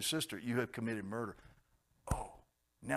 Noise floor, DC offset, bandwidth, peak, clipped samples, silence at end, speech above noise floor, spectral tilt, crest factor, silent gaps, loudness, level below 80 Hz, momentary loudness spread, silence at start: -73 dBFS; under 0.1%; 15.5 kHz; -20 dBFS; under 0.1%; 0 s; 34 dB; -4 dB/octave; 22 dB; none; -40 LUFS; -54 dBFS; 15 LU; 0 s